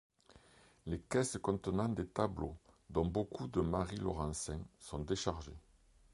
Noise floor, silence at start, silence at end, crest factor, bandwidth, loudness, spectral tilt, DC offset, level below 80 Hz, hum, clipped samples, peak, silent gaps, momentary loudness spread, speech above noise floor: -65 dBFS; 0.3 s; 0.55 s; 22 dB; 11.5 kHz; -39 LUFS; -5.5 dB/octave; under 0.1%; -52 dBFS; none; under 0.1%; -18 dBFS; none; 11 LU; 27 dB